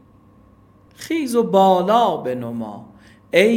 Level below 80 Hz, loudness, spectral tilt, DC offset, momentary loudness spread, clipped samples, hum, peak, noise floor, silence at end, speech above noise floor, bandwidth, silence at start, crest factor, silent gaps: -60 dBFS; -18 LUFS; -5.5 dB/octave; under 0.1%; 18 LU; under 0.1%; none; 0 dBFS; -51 dBFS; 0 s; 33 dB; 17 kHz; 1 s; 18 dB; none